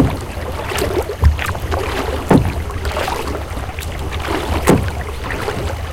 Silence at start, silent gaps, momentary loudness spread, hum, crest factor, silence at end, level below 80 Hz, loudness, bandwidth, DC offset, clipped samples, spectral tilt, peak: 0 s; none; 10 LU; none; 18 dB; 0 s; -24 dBFS; -19 LUFS; 17 kHz; under 0.1%; under 0.1%; -6 dB/octave; 0 dBFS